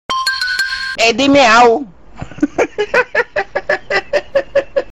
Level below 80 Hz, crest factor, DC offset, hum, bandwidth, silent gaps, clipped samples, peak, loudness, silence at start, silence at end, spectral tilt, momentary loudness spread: -44 dBFS; 12 dB; 0.9%; none; 14.5 kHz; none; under 0.1%; -2 dBFS; -13 LUFS; 0.1 s; 0.1 s; -3 dB/octave; 11 LU